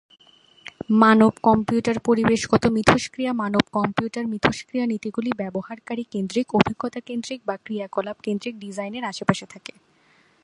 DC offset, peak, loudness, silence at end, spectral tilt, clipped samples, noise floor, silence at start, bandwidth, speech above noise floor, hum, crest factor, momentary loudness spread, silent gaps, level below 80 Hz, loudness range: under 0.1%; 0 dBFS; -22 LUFS; 0.85 s; -5.5 dB/octave; under 0.1%; -59 dBFS; 0.9 s; 11 kHz; 37 dB; none; 22 dB; 14 LU; none; -52 dBFS; 9 LU